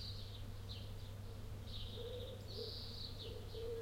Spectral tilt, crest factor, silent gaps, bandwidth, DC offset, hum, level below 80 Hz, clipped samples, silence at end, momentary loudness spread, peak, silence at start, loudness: -5.5 dB/octave; 12 dB; none; 16.5 kHz; under 0.1%; none; -54 dBFS; under 0.1%; 0 s; 4 LU; -36 dBFS; 0 s; -49 LUFS